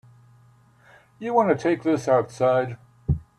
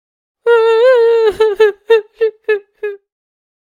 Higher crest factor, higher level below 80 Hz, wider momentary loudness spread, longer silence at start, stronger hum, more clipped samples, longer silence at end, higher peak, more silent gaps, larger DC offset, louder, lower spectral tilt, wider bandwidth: about the same, 18 dB vs 14 dB; first, -44 dBFS vs -54 dBFS; about the same, 12 LU vs 13 LU; first, 1.2 s vs 0.45 s; neither; neither; second, 0.15 s vs 0.7 s; second, -6 dBFS vs 0 dBFS; neither; neither; second, -23 LUFS vs -12 LUFS; first, -7.5 dB/octave vs -3 dB/octave; first, 12 kHz vs 10 kHz